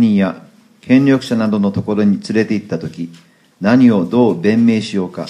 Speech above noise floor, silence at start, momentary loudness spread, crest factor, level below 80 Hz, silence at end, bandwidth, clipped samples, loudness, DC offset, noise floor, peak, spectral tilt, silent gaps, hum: 28 dB; 0 s; 13 LU; 14 dB; -56 dBFS; 0 s; 10.5 kHz; under 0.1%; -14 LUFS; under 0.1%; -42 dBFS; 0 dBFS; -7.5 dB/octave; none; none